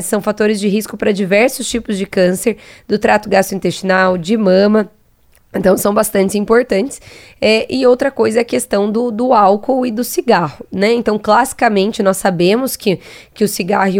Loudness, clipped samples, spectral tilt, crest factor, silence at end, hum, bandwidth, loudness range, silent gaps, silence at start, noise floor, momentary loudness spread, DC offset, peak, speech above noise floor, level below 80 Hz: -14 LUFS; under 0.1%; -5 dB/octave; 14 dB; 0 s; none; 17.5 kHz; 1 LU; none; 0 s; -52 dBFS; 7 LU; under 0.1%; 0 dBFS; 38 dB; -46 dBFS